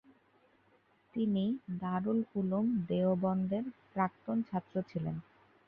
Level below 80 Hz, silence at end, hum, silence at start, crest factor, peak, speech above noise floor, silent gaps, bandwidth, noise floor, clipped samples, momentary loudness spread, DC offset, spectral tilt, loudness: -70 dBFS; 0.45 s; none; 1.15 s; 16 dB; -18 dBFS; 36 dB; none; 4.6 kHz; -69 dBFS; under 0.1%; 7 LU; under 0.1%; -11 dB/octave; -35 LUFS